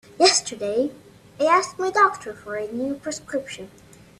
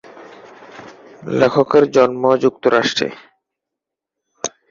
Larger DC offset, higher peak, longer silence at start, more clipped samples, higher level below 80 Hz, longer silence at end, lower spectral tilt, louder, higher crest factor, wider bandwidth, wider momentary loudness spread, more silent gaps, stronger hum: neither; about the same, -2 dBFS vs -2 dBFS; about the same, 0.2 s vs 0.2 s; neither; about the same, -62 dBFS vs -58 dBFS; first, 0.5 s vs 0.25 s; second, -1.5 dB/octave vs -4.5 dB/octave; second, -22 LUFS vs -16 LUFS; about the same, 22 dB vs 18 dB; first, 13.5 kHz vs 7.6 kHz; about the same, 17 LU vs 18 LU; neither; neither